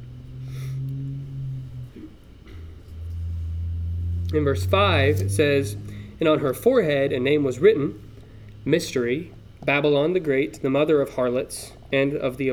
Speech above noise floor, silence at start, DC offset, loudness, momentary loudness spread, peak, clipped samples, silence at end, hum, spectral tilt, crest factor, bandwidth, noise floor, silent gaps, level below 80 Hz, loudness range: 22 dB; 0 s; under 0.1%; -23 LUFS; 19 LU; -6 dBFS; under 0.1%; 0 s; none; -6 dB/octave; 18 dB; 17.5 kHz; -43 dBFS; none; -42 dBFS; 12 LU